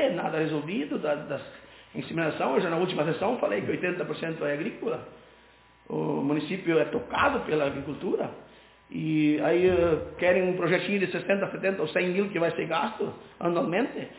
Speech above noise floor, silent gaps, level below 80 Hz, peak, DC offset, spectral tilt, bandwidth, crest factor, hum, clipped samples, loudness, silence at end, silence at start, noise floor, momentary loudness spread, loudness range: 30 dB; none; -56 dBFS; -10 dBFS; under 0.1%; -10 dB/octave; 4 kHz; 18 dB; none; under 0.1%; -28 LUFS; 0 s; 0 s; -57 dBFS; 10 LU; 5 LU